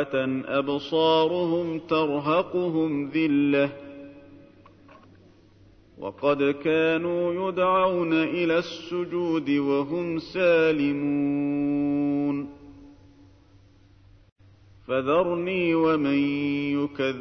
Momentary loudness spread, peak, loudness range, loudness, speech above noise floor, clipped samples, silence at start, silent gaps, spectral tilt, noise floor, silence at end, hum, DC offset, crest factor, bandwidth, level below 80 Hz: 7 LU; -10 dBFS; 6 LU; -24 LUFS; 31 dB; under 0.1%; 0 s; 14.32-14.36 s; -7.5 dB/octave; -55 dBFS; 0 s; none; under 0.1%; 16 dB; 6.4 kHz; -62 dBFS